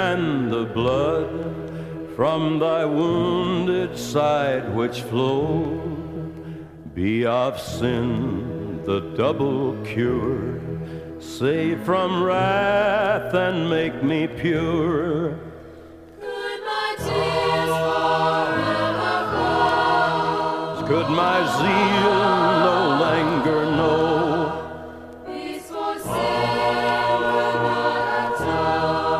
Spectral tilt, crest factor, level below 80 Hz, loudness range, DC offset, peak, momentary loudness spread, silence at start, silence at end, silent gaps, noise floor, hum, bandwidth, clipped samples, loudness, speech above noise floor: -6 dB/octave; 16 dB; -48 dBFS; 5 LU; under 0.1%; -6 dBFS; 12 LU; 0 s; 0 s; none; -42 dBFS; none; 15 kHz; under 0.1%; -21 LUFS; 21 dB